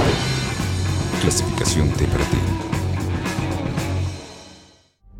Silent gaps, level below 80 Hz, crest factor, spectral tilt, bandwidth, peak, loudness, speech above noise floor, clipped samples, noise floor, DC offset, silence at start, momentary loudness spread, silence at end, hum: none; -32 dBFS; 16 dB; -5 dB/octave; 16.5 kHz; -4 dBFS; -22 LUFS; 32 dB; under 0.1%; -51 dBFS; under 0.1%; 0 s; 6 LU; 0 s; none